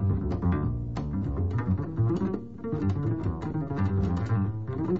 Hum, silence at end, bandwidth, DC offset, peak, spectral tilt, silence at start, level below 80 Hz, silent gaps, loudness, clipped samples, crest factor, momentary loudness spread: none; 0 s; 6.8 kHz; 0.4%; -16 dBFS; -10 dB/octave; 0 s; -40 dBFS; none; -29 LUFS; under 0.1%; 12 dB; 5 LU